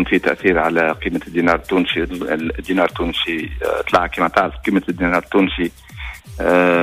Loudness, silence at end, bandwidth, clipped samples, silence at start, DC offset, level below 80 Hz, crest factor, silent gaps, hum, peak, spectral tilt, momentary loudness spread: -18 LUFS; 0 s; 15.5 kHz; under 0.1%; 0 s; under 0.1%; -36 dBFS; 16 dB; none; none; -2 dBFS; -6 dB/octave; 7 LU